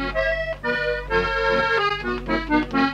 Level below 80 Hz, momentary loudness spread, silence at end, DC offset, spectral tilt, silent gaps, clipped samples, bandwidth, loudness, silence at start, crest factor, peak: -36 dBFS; 5 LU; 0 s; under 0.1%; -5.5 dB/octave; none; under 0.1%; 11.5 kHz; -22 LUFS; 0 s; 16 dB; -6 dBFS